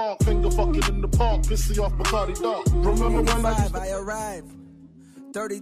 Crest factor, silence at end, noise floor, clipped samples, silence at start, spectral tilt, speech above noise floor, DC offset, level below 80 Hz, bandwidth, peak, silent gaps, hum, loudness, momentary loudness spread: 14 dB; 0 s; -48 dBFS; under 0.1%; 0 s; -5.5 dB/octave; 26 dB; under 0.1%; -24 dBFS; 14.5 kHz; -8 dBFS; none; none; -24 LUFS; 9 LU